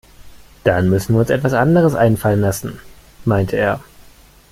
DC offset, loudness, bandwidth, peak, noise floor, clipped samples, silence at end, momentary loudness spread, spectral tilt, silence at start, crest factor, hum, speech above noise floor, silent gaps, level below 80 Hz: under 0.1%; -16 LUFS; 16 kHz; -2 dBFS; -45 dBFS; under 0.1%; 0.7 s; 11 LU; -7 dB/octave; 0.2 s; 16 dB; none; 30 dB; none; -42 dBFS